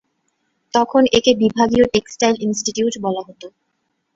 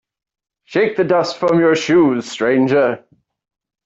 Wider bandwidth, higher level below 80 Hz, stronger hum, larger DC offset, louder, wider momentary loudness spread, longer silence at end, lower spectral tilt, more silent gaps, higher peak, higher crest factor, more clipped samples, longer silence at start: about the same, 8 kHz vs 8 kHz; first, -48 dBFS vs -58 dBFS; neither; neither; about the same, -17 LUFS vs -15 LUFS; first, 10 LU vs 6 LU; second, 0.7 s vs 0.85 s; second, -4 dB/octave vs -6 dB/octave; neither; about the same, -2 dBFS vs -4 dBFS; about the same, 16 dB vs 14 dB; neither; about the same, 0.75 s vs 0.7 s